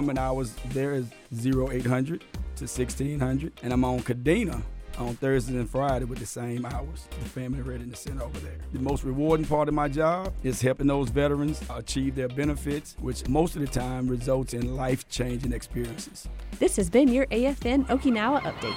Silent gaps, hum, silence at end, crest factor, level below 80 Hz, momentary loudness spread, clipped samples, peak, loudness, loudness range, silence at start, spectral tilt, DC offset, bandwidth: none; none; 0 s; 20 dB; -38 dBFS; 12 LU; under 0.1%; -8 dBFS; -28 LUFS; 5 LU; 0 s; -6 dB/octave; under 0.1%; 16 kHz